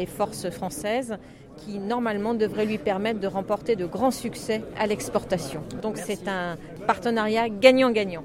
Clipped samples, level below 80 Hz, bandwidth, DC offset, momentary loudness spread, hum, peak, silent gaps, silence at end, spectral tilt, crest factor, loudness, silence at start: under 0.1%; -54 dBFS; 16 kHz; under 0.1%; 11 LU; none; -2 dBFS; none; 0 s; -5 dB/octave; 24 dB; -25 LUFS; 0 s